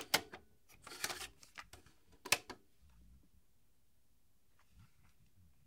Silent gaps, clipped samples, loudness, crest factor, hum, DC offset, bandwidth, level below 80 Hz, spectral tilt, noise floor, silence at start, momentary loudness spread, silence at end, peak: none; under 0.1%; -39 LUFS; 32 dB; none; under 0.1%; 16 kHz; -72 dBFS; -0.5 dB/octave; -77 dBFS; 0 s; 23 LU; 0.8 s; -14 dBFS